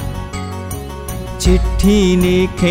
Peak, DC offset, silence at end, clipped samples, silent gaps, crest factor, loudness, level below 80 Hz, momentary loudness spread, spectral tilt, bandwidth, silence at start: -2 dBFS; under 0.1%; 0 s; under 0.1%; none; 12 dB; -16 LUFS; -22 dBFS; 14 LU; -6 dB/octave; 16 kHz; 0 s